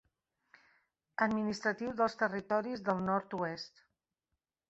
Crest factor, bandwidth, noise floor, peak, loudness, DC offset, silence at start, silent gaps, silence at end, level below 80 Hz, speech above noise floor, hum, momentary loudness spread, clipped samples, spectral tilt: 22 dB; 8 kHz; -88 dBFS; -16 dBFS; -35 LUFS; under 0.1%; 1.2 s; none; 1 s; -72 dBFS; 54 dB; none; 8 LU; under 0.1%; -4 dB/octave